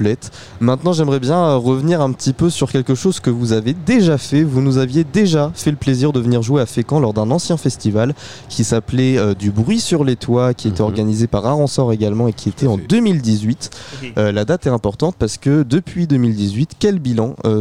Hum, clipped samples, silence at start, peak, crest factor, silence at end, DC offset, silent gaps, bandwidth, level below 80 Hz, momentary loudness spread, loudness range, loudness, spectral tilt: none; under 0.1%; 0 s; -2 dBFS; 12 dB; 0 s; 0.6%; none; 13.5 kHz; -42 dBFS; 5 LU; 2 LU; -16 LUFS; -6.5 dB/octave